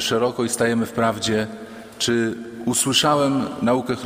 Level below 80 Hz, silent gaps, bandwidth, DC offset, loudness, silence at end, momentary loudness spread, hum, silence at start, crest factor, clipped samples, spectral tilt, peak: -56 dBFS; none; 16 kHz; under 0.1%; -21 LUFS; 0 s; 10 LU; none; 0 s; 18 dB; under 0.1%; -3.5 dB/octave; -4 dBFS